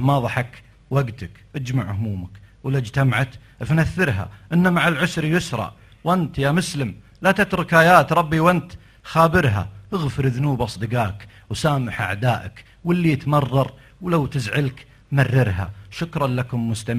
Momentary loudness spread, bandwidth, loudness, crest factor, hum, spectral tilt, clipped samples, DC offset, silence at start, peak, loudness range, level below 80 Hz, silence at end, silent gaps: 14 LU; 14.5 kHz; -21 LUFS; 20 dB; none; -6.5 dB/octave; under 0.1%; under 0.1%; 0 s; 0 dBFS; 6 LU; -42 dBFS; 0 s; none